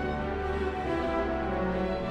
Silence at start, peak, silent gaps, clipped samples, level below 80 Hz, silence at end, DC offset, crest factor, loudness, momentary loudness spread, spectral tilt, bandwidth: 0 s; -18 dBFS; none; under 0.1%; -40 dBFS; 0 s; under 0.1%; 12 dB; -31 LUFS; 2 LU; -7.5 dB/octave; 10 kHz